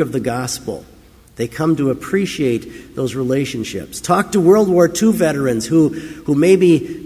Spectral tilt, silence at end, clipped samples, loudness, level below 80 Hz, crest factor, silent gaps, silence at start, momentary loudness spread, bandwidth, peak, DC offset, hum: -6 dB/octave; 0 s; under 0.1%; -16 LUFS; -46 dBFS; 16 dB; none; 0 s; 14 LU; 16 kHz; 0 dBFS; under 0.1%; none